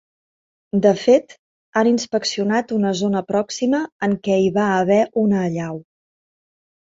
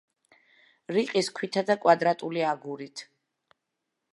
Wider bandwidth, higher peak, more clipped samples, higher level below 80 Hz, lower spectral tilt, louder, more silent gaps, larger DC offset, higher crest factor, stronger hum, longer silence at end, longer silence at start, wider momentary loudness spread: second, 7.8 kHz vs 11.5 kHz; first, -2 dBFS vs -6 dBFS; neither; first, -60 dBFS vs -84 dBFS; about the same, -5.5 dB/octave vs -4.5 dB/octave; first, -19 LUFS vs -26 LUFS; first, 1.39-1.73 s, 3.92-4.00 s vs none; neither; second, 18 dB vs 24 dB; neither; about the same, 1.05 s vs 1.1 s; second, 0.75 s vs 0.9 s; second, 7 LU vs 16 LU